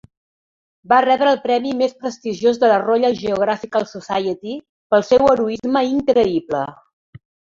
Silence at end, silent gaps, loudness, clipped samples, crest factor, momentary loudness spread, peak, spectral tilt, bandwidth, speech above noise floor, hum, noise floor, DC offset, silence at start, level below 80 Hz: 0.85 s; 4.69-4.90 s; -18 LUFS; under 0.1%; 16 dB; 11 LU; -2 dBFS; -5.5 dB/octave; 7.6 kHz; over 73 dB; none; under -90 dBFS; under 0.1%; 0.9 s; -54 dBFS